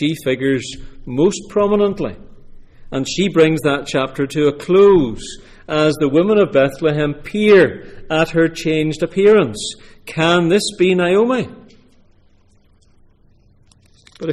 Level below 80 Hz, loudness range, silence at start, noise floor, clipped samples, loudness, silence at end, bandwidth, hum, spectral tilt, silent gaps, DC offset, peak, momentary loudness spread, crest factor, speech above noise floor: -42 dBFS; 4 LU; 0 s; -52 dBFS; under 0.1%; -16 LUFS; 0 s; 13.5 kHz; none; -5.5 dB/octave; none; under 0.1%; -2 dBFS; 15 LU; 14 dB; 37 dB